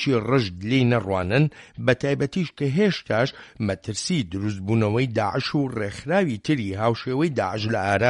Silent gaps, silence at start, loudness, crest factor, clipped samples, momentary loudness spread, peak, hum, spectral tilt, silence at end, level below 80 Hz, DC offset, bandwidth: none; 0 s; -24 LUFS; 18 dB; under 0.1%; 6 LU; -4 dBFS; none; -6 dB/octave; 0 s; -54 dBFS; under 0.1%; 11.5 kHz